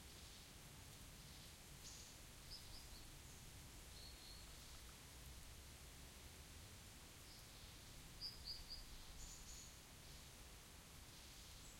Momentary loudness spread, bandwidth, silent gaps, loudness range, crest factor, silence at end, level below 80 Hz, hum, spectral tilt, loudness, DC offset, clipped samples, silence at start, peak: 7 LU; 16.5 kHz; none; 3 LU; 20 dB; 0 s; -64 dBFS; none; -2.5 dB/octave; -58 LUFS; under 0.1%; under 0.1%; 0 s; -38 dBFS